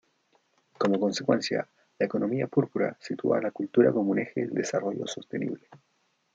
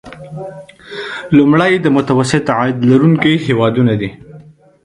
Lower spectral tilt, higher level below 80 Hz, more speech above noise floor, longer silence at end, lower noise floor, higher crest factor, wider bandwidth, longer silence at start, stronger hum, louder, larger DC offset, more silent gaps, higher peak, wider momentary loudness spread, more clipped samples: about the same, -6 dB/octave vs -7 dB/octave; second, -76 dBFS vs -48 dBFS; first, 42 dB vs 27 dB; first, 0.6 s vs 0.45 s; first, -69 dBFS vs -39 dBFS; first, 20 dB vs 14 dB; second, 8.8 kHz vs 11 kHz; first, 0.8 s vs 0.05 s; neither; second, -28 LUFS vs -12 LUFS; neither; neither; second, -8 dBFS vs 0 dBFS; second, 10 LU vs 18 LU; neither